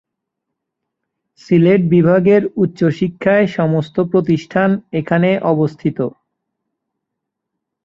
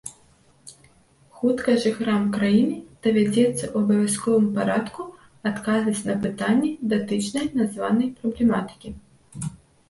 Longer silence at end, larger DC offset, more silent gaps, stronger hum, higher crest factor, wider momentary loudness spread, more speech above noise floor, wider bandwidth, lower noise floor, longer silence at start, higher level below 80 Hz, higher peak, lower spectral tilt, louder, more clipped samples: first, 1.75 s vs 0.35 s; neither; neither; neither; about the same, 14 dB vs 16 dB; second, 7 LU vs 14 LU; first, 65 dB vs 35 dB; second, 7.4 kHz vs 12 kHz; first, -79 dBFS vs -57 dBFS; first, 1.5 s vs 0.05 s; about the same, -54 dBFS vs -56 dBFS; first, -2 dBFS vs -6 dBFS; first, -9 dB/octave vs -5.5 dB/octave; first, -15 LUFS vs -23 LUFS; neither